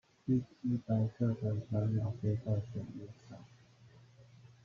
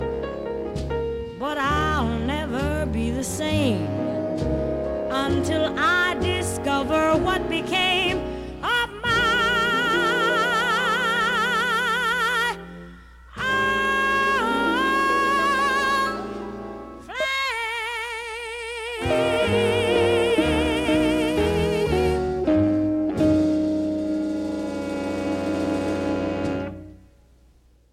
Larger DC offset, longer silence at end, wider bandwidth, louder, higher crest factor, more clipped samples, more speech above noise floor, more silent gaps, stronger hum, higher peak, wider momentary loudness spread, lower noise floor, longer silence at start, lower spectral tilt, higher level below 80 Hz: neither; second, 0.15 s vs 1 s; second, 6.8 kHz vs 16.5 kHz; second, -36 LUFS vs -22 LUFS; about the same, 16 dB vs 16 dB; neither; second, 25 dB vs 33 dB; neither; neither; second, -20 dBFS vs -8 dBFS; first, 17 LU vs 10 LU; first, -60 dBFS vs -56 dBFS; first, 0.25 s vs 0 s; first, -10 dB/octave vs -5 dB/octave; second, -66 dBFS vs -40 dBFS